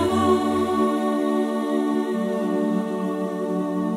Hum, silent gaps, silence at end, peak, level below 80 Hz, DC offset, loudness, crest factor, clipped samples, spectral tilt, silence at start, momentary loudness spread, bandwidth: none; none; 0 s; -8 dBFS; -58 dBFS; under 0.1%; -23 LUFS; 14 dB; under 0.1%; -6.5 dB/octave; 0 s; 6 LU; 15.5 kHz